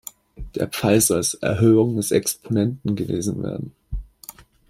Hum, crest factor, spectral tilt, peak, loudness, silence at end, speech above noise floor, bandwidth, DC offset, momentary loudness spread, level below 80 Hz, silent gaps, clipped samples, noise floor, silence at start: none; 18 dB; -5 dB/octave; -4 dBFS; -20 LUFS; 0.3 s; 24 dB; 16 kHz; under 0.1%; 19 LU; -42 dBFS; none; under 0.1%; -44 dBFS; 0.4 s